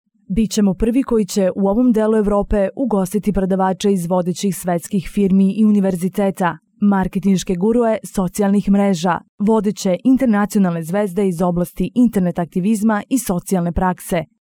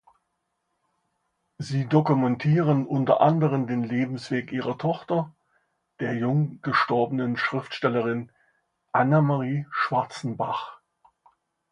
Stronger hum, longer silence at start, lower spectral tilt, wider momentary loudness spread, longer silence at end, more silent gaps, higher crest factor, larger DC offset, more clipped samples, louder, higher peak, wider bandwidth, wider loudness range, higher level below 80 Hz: neither; second, 0.3 s vs 1.6 s; second, -6.5 dB/octave vs -8 dB/octave; second, 6 LU vs 10 LU; second, 0.25 s vs 0.95 s; first, 9.29-9.38 s vs none; second, 10 dB vs 20 dB; neither; neither; first, -17 LUFS vs -25 LUFS; about the same, -6 dBFS vs -6 dBFS; first, 17 kHz vs 9.6 kHz; second, 1 LU vs 4 LU; first, -36 dBFS vs -68 dBFS